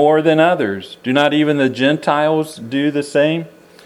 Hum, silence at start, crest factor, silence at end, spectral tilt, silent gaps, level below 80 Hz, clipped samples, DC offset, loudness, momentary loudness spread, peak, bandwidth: none; 0 s; 16 dB; 0.4 s; -6 dB/octave; none; -66 dBFS; under 0.1%; under 0.1%; -16 LUFS; 9 LU; 0 dBFS; 13 kHz